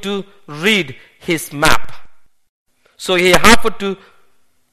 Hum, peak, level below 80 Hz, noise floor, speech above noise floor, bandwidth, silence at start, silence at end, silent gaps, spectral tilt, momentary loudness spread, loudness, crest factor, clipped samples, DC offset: none; 0 dBFS; -34 dBFS; -57 dBFS; 43 dB; over 20 kHz; 0 s; 0 s; 2.49-2.65 s; -3 dB/octave; 18 LU; -14 LUFS; 16 dB; 0.2%; under 0.1%